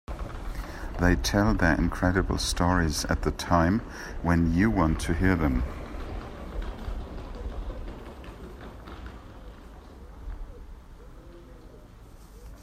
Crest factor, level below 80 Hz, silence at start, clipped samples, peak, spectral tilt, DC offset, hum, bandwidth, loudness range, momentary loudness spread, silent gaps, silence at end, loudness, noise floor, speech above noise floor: 22 dB; -36 dBFS; 0.1 s; under 0.1%; -6 dBFS; -5.5 dB/octave; under 0.1%; none; 15 kHz; 20 LU; 24 LU; none; 0 s; -27 LUFS; -48 dBFS; 23 dB